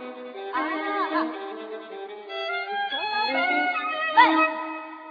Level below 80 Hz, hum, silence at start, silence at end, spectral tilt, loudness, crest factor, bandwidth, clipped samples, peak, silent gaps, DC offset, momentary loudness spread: -74 dBFS; none; 0 s; 0 s; -4 dB/octave; -24 LUFS; 22 dB; 5 kHz; under 0.1%; -4 dBFS; none; under 0.1%; 18 LU